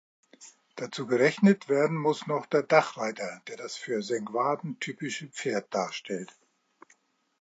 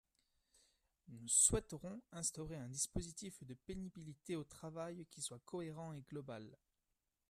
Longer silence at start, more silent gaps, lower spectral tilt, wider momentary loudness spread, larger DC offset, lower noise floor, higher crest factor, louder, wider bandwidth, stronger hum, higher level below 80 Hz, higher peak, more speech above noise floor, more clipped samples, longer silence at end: second, 0.4 s vs 1.05 s; neither; first, -5.5 dB/octave vs -3.5 dB/octave; second, 15 LU vs 20 LU; neither; second, -66 dBFS vs -89 dBFS; second, 22 dB vs 28 dB; first, -28 LUFS vs -41 LUFS; second, 9 kHz vs 14 kHz; neither; second, -80 dBFS vs -60 dBFS; first, -6 dBFS vs -18 dBFS; second, 38 dB vs 44 dB; neither; first, 1.15 s vs 0.75 s